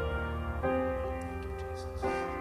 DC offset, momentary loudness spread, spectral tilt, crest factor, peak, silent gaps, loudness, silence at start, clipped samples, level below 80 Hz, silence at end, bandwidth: under 0.1%; 8 LU; -7 dB/octave; 14 dB; -20 dBFS; none; -35 LUFS; 0 s; under 0.1%; -42 dBFS; 0 s; 15 kHz